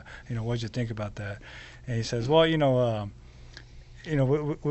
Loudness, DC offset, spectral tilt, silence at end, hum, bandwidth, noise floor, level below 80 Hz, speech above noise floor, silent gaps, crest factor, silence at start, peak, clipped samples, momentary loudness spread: -27 LUFS; under 0.1%; -6.5 dB/octave; 0 s; none; 8.2 kHz; -47 dBFS; -48 dBFS; 20 dB; none; 20 dB; 0 s; -8 dBFS; under 0.1%; 22 LU